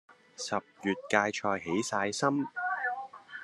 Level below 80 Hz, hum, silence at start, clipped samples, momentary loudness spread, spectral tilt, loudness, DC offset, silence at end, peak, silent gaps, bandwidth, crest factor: -78 dBFS; none; 0.1 s; under 0.1%; 7 LU; -4 dB/octave; -32 LUFS; under 0.1%; 0 s; -8 dBFS; none; 12.5 kHz; 24 dB